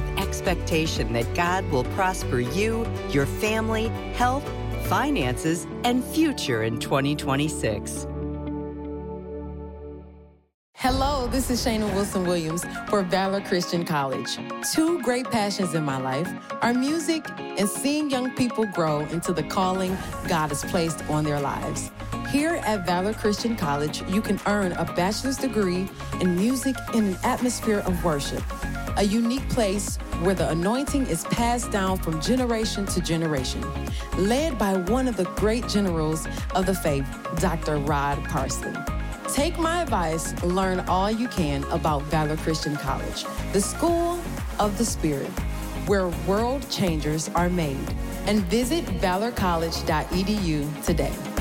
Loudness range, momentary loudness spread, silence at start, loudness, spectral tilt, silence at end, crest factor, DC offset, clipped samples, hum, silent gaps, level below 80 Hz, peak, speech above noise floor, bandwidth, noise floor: 2 LU; 7 LU; 0 s; -25 LUFS; -5 dB/octave; 0 s; 14 dB; under 0.1%; under 0.1%; none; 10.54-10.73 s; -36 dBFS; -12 dBFS; 24 dB; 17 kHz; -48 dBFS